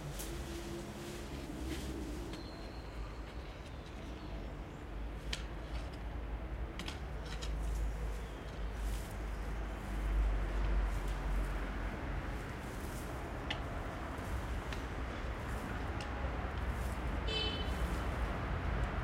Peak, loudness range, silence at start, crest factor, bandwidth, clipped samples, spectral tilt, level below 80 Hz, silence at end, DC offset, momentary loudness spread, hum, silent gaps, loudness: -22 dBFS; 6 LU; 0 s; 18 dB; 16 kHz; under 0.1%; -5.5 dB/octave; -40 dBFS; 0 s; under 0.1%; 9 LU; none; none; -42 LUFS